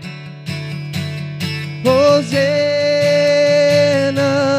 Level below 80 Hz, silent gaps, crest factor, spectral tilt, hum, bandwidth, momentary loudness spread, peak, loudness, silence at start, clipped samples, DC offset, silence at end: -60 dBFS; none; 14 dB; -5.5 dB/octave; none; 15.5 kHz; 13 LU; 0 dBFS; -15 LUFS; 0 s; under 0.1%; under 0.1%; 0 s